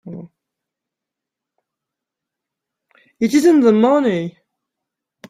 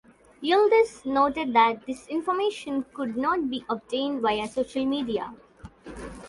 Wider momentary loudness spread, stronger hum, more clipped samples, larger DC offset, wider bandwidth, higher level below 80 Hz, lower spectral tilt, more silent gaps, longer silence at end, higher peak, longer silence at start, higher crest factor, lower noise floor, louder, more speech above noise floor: first, 21 LU vs 12 LU; neither; neither; neither; first, 15 kHz vs 11.5 kHz; second, -64 dBFS vs -56 dBFS; first, -6 dB/octave vs -4.5 dB/octave; neither; first, 1 s vs 0 s; first, -2 dBFS vs -8 dBFS; second, 0.05 s vs 0.4 s; about the same, 18 dB vs 18 dB; first, -84 dBFS vs -44 dBFS; first, -14 LUFS vs -25 LUFS; first, 71 dB vs 19 dB